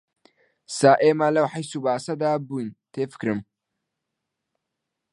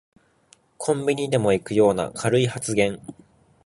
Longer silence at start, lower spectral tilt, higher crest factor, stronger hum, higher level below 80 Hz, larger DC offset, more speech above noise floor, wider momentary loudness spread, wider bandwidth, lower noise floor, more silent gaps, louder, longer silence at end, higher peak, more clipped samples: about the same, 0.7 s vs 0.8 s; about the same, -5.5 dB/octave vs -5.5 dB/octave; about the same, 22 dB vs 18 dB; neither; second, -70 dBFS vs -54 dBFS; neither; first, 60 dB vs 37 dB; first, 15 LU vs 8 LU; about the same, 11.5 kHz vs 11.5 kHz; first, -82 dBFS vs -59 dBFS; neither; about the same, -23 LUFS vs -22 LUFS; first, 1.7 s vs 0.55 s; first, -2 dBFS vs -6 dBFS; neither